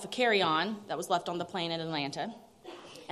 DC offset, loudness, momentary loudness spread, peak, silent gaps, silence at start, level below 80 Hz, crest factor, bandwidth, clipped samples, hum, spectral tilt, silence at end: under 0.1%; -31 LUFS; 21 LU; -14 dBFS; none; 0 s; -76 dBFS; 18 dB; 14 kHz; under 0.1%; none; -4 dB/octave; 0 s